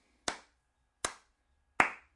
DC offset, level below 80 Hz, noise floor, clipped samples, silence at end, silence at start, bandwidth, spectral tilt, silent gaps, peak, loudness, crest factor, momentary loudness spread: under 0.1%; -66 dBFS; -77 dBFS; under 0.1%; 0.15 s; 0.25 s; 11.5 kHz; -1.5 dB/octave; none; -6 dBFS; -35 LUFS; 34 dB; 10 LU